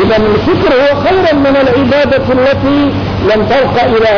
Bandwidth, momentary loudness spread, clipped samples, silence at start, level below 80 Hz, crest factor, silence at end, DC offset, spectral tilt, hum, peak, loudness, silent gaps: 5.4 kHz; 2 LU; under 0.1%; 0 s; -30 dBFS; 6 dB; 0 s; 1%; -7.5 dB/octave; none; -2 dBFS; -9 LUFS; none